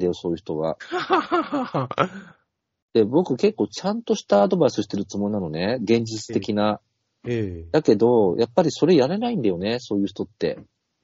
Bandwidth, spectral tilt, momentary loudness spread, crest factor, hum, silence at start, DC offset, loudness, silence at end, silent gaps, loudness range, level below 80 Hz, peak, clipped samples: 7.8 kHz; -5.5 dB/octave; 10 LU; 20 dB; none; 0 s; under 0.1%; -22 LUFS; 0.4 s; 2.82-2.88 s; 3 LU; -58 dBFS; -4 dBFS; under 0.1%